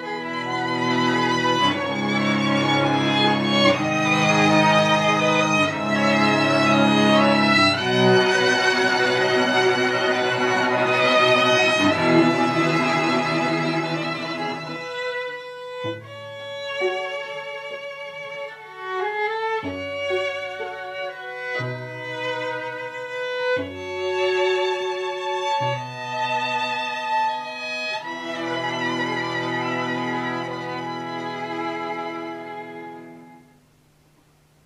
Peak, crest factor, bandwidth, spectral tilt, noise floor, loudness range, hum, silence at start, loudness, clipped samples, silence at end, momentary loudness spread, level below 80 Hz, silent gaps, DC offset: -4 dBFS; 18 dB; 13.5 kHz; -4.5 dB/octave; -57 dBFS; 11 LU; none; 0 s; -21 LUFS; under 0.1%; 1.25 s; 15 LU; -72 dBFS; none; under 0.1%